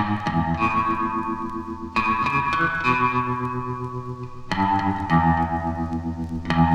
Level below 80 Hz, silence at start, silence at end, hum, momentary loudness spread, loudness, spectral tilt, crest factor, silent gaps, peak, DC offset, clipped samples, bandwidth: -40 dBFS; 0 s; 0 s; none; 10 LU; -23 LUFS; -7 dB/octave; 18 dB; none; -6 dBFS; under 0.1%; under 0.1%; 9.4 kHz